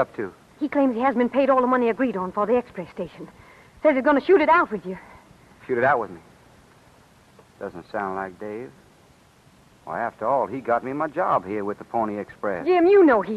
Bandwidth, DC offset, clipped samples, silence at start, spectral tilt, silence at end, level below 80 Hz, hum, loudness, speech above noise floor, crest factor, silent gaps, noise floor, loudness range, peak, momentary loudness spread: 9.8 kHz; under 0.1%; under 0.1%; 0 s; -7.5 dB/octave; 0 s; -60 dBFS; none; -22 LUFS; 33 dB; 16 dB; none; -55 dBFS; 13 LU; -6 dBFS; 19 LU